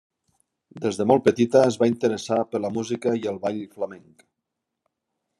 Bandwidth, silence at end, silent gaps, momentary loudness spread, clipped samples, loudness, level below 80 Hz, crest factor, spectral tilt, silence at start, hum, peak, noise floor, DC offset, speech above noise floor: 12 kHz; 1.4 s; none; 12 LU; under 0.1%; -23 LUFS; -70 dBFS; 20 dB; -6 dB/octave; 0.75 s; none; -4 dBFS; -82 dBFS; under 0.1%; 60 dB